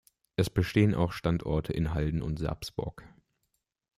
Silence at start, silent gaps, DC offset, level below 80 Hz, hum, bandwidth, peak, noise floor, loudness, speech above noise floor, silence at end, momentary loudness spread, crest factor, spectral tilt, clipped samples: 0.4 s; none; under 0.1%; -44 dBFS; none; 15 kHz; -12 dBFS; -80 dBFS; -30 LUFS; 51 dB; 0.9 s; 11 LU; 20 dB; -7 dB/octave; under 0.1%